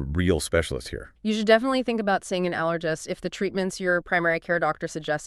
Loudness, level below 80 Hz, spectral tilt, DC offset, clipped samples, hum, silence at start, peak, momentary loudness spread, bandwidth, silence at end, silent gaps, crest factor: -25 LUFS; -44 dBFS; -5 dB/octave; under 0.1%; under 0.1%; none; 0 s; -4 dBFS; 11 LU; 13.5 kHz; 0 s; none; 20 dB